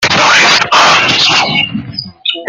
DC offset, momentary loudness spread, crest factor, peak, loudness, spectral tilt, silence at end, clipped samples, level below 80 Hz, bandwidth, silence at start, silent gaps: under 0.1%; 11 LU; 10 dB; 0 dBFS; -7 LUFS; -1.5 dB/octave; 0 s; 0.2%; -48 dBFS; over 20 kHz; 0 s; none